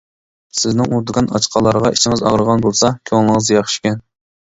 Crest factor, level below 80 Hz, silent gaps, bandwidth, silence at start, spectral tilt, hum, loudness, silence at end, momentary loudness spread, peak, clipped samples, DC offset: 16 dB; -44 dBFS; none; 8 kHz; 0.55 s; -4.5 dB/octave; none; -15 LUFS; 0.4 s; 6 LU; 0 dBFS; under 0.1%; under 0.1%